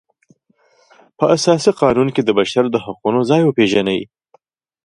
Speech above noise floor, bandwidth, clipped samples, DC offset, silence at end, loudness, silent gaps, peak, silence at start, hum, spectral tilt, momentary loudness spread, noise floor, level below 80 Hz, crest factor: 43 dB; 11.5 kHz; under 0.1%; under 0.1%; 0.8 s; -15 LUFS; none; 0 dBFS; 1.2 s; none; -5.5 dB/octave; 7 LU; -57 dBFS; -54 dBFS; 16 dB